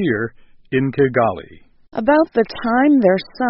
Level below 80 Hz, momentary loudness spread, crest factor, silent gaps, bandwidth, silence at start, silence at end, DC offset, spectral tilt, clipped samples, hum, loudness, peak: -50 dBFS; 11 LU; 16 dB; none; 5.8 kHz; 0 s; 0 s; under 0.1%; -5.5 dB/octave; under 0.1%; none; -17 LUFS; -2 dBFS